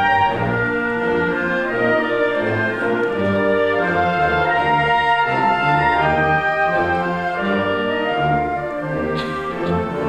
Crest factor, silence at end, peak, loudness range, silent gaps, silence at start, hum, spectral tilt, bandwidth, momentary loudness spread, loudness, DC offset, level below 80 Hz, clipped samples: 14 dB; 0 s; -4 dBFS; 3 LU; none; 0 s; none; -7 dB/octave; 10.5 kHz; 6 LU; -18 LUFS; under 0.1%; -42 dBFS; under 0.1%